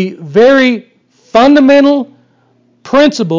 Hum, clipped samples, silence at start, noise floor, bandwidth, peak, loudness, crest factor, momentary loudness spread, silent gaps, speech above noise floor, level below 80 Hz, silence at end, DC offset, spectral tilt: none; under 0.1%; 0 s; -52 dBFS; 7.6 kHz; 0 dBFS; -8 LUFS; 10 dB; 10 LU; none; 44 dB; -50 dBFS; 0 s; 0.5%; -5.5 dB/octave